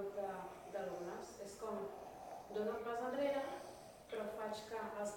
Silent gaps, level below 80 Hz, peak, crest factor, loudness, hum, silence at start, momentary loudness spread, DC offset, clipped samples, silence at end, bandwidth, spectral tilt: none; -74 dBFS; -28 dBFS; 16 dB; -45 LUFS; none; 0 s; 12 LU; under 0.1%; under 0.1%; 0 s; 17 kHz; -4.5 dB/octave